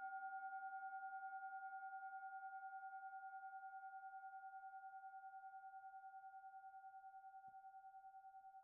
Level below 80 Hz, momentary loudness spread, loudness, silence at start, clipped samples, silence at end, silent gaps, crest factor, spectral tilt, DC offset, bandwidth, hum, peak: under -90 dBFS; 10 LU; -56 LUFS; 0 s; under 0.1%; 0 s; none; 12 dB; 8.5 dB/octave; under 0.1%; 2.3 kHz; none; -44 dBFS